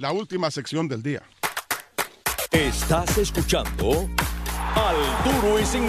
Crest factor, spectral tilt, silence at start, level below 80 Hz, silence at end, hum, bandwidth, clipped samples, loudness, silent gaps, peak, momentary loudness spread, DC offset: 18 dB; -4 dB/octave; 0 s; -32 dBFS; 0 s; none; 14.5 kHz; under 0.1%; -24 LUFS; none; -6 dBFS; 8 LU; under 0.1%